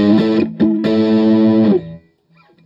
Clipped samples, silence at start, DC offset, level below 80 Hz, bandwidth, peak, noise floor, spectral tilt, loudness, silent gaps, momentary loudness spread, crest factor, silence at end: under 0.1%; 0 s; under 0.1%; -56 dBFS; 5.8 kHz; -2 dBFS; -52 dBFS; -9 dB/octave; -13 LUFS; none; 4 LU; 12 dB; 0.7 s